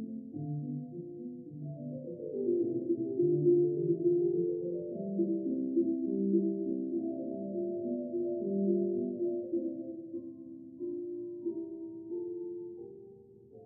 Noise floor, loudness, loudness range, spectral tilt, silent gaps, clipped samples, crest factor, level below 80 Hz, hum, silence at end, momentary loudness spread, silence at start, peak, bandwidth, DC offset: -55 dBFS; -34 LUFS; 9 LU; -17 dB/octave; none; under 0.1%; 16 dB; -80 dBFS; none; 0 s; 14 LU; 0 s; -18 dBFS; 1 kHz; under 0.1%